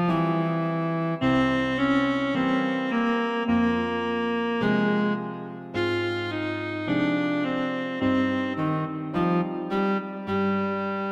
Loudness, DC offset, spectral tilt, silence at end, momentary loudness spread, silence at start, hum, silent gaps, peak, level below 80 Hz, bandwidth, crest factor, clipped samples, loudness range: -25 LUFS; under 0.1%; -7.5 dB/octave; 0 s; 6 LU; 0 s; none; none; -10 dBFS; -54 dBFS; 8.6 kHz; 14 dB; under 0.1%; 2 LU